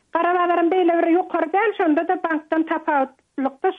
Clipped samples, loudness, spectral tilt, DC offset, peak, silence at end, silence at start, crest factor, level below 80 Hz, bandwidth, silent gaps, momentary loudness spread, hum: under 0.1%; -20 LUFS; -6 dB/octave; under 0.1%; -8 dBFS; 0 s; 0.15 s; 12 dB; -72 dBFS; 3.9 kHz; none; 5 LU; none